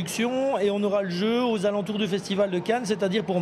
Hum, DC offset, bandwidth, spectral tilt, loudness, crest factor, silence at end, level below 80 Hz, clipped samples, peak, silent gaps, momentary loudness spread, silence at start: none; under 0.1%; 14.5 kHz; -5.5 dB/octave; -25 LUFS; 14 dB; 0 s; -66 dBFS; under 0.1%; -10 dBFS; none; 3 LU; 0 s